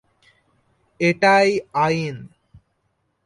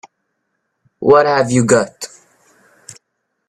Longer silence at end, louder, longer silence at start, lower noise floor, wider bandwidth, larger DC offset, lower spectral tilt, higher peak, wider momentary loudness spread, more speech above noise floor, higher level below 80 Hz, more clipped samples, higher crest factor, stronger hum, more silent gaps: first, 1 s vs 0.55 s; second, -19 LUFS vs -13 LUFS; about the same, 1 s vs 1 s; about the same, -70 dBFS vs -72 dBFS; second, 11.5 kHz vs 13 kHz; neither; about the same, -5.5 dB/octave vs -5 dB/octave; second, -4 dBFS vs 0 dBFS; second, 13 LU vs 18 LU; second, 52 dB vs 59 dB; second, -60 dBFS vs -54 dBFS; neither; about the same, 18 dB vs 18 dB; neither; neither